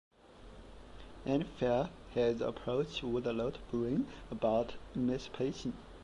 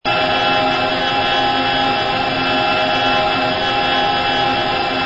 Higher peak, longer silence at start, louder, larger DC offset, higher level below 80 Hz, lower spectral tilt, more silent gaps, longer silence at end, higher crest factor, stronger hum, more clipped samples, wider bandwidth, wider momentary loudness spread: second, -20 dBFS vs -4 dBFS; first, 0.25 s vs 0.05 s; second, -36 LUFS vs -15 LUFS; neither; second, -56 dBFS vs -42 dBFS; first, -7 dB/octave vs -4.5 dB/octave; neither; about the same, 0 s vs 0 s; about the same, 16 dB vs 12 dB; neither; neither; first, 11 kHz vs 8 kHz; first, 21 LU vs 2 LU